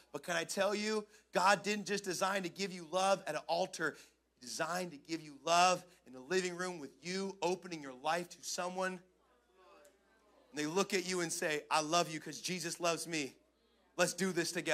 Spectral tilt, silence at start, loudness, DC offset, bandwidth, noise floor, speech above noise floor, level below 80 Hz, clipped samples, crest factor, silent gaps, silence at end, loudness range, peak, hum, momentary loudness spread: -3 dB/octave; 0.15 s; -36 LUFS; under 0.1%; 16 kHz; -73 dBFS; 36 dB; -82 dBFS; under 0.1%; 24 dB; none; 0 s; 6 LU; -14 dBFS; none; 11 LU